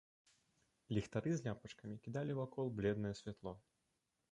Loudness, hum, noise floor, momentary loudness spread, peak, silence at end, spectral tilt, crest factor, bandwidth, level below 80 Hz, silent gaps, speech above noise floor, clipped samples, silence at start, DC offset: -44 LUFS; none; -86 dBFS; 12 LU; -24 dBFS; 0.75 s; -7 dB/octave; 20 dB; 10.5 kHz; -68 dBFS; none; 43 dB; under 0.1%; 0.9 s; under 0.1%